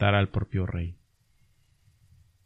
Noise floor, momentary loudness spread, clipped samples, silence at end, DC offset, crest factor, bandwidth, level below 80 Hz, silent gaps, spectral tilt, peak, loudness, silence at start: -65 dBFS; 15 LU; under 0.1%; 1.5 s; under 0.1%; 20 dB; 4 kHz; -48 dBFS; none; -9 dB/octave; -10 dBFS; -29 LUFS; 0 s